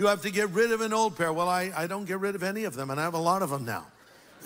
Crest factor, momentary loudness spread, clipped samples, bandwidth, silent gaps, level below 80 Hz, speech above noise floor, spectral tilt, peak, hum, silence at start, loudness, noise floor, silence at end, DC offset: 16 dB; 7 LU; under 0.1%; 16 kHz; none; -68 dBFS; 26 dB; -4.5 dB/octave; -12 dBFS; none; 0 s; -28 LUFS; -53 dBFS; 0 s; under 0.1%